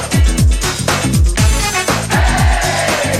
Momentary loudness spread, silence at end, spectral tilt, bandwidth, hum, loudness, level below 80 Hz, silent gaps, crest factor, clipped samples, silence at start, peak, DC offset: 3 LU; 0 s; -4 dB/octave; 16 kHz; none; -13 LUFS; -16 dBFS; none; 12 dB; under 0.1%; 0 s; 0 dBFS; under 0.1%